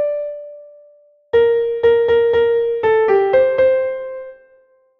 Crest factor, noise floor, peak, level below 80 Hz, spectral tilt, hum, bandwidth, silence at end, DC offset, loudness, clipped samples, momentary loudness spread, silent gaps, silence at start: 14 dB; -54 dBFS; -4 dBFS; -52 dBFS; -7 dB/octave; none; 4.6 kHz; 0.65 s; under 0.1%; -15 LUFS; under 0.1%; 15 LU; none; 0 s